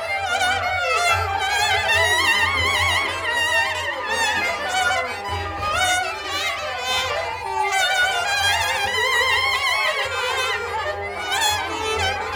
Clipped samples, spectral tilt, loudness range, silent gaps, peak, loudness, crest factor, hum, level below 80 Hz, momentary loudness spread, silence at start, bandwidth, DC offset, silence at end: under 0.1%; -1 dB/octave; 4 LU; none; -4 dBFS; -20 LUFS; 16 dB; none; -46 dBFS; 7 LU; 0 s; 20 kHz; under 0.1%; 0 s